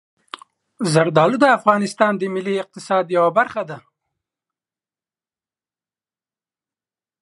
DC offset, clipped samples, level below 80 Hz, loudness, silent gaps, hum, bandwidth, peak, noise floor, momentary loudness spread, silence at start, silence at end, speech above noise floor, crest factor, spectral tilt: under 0.1%; under 0.1%; -70 dBFS; -18 LUFS; none; none; 11.5 kHz; 0 dBFS; under -90 dBFS; 23 LU; 0.8 s; 3.4 s; over 73 dB; 20 dB; -5.5 dB/octave